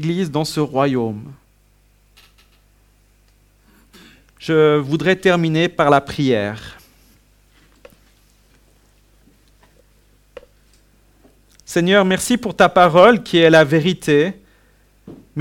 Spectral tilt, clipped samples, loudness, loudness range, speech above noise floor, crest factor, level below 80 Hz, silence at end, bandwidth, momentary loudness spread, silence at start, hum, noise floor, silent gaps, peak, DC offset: -5.5 dB/octave; under 0.1%; -15 LUFS; 13 LU; 40 dB; 18 dB; -52 dBFS; 0 s; 17.5 kHz; 13 LU; 0 s; 50 Hz at -50 dBFS; -55 dBFS; none; 0 dBFS; under 0.1%